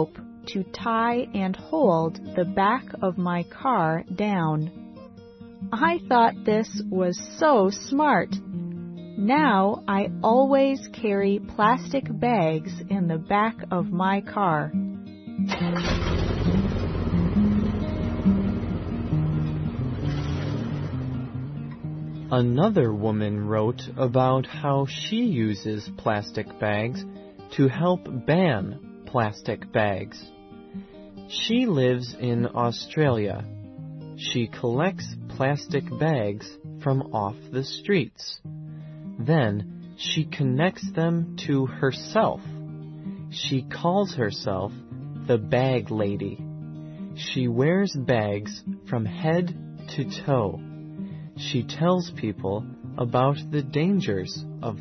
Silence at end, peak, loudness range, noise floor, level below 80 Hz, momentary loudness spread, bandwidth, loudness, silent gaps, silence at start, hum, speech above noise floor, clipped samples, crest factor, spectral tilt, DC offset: 0 s; -6 dBFS; 5 LU; -45 dBFS; -44 dBFS; 15 LU; 6.4 kHz; -25 LUFS; none; 0 s; none; 21 dB; under 0.1%; 18 dB; -7 dB/octave; under 0.1%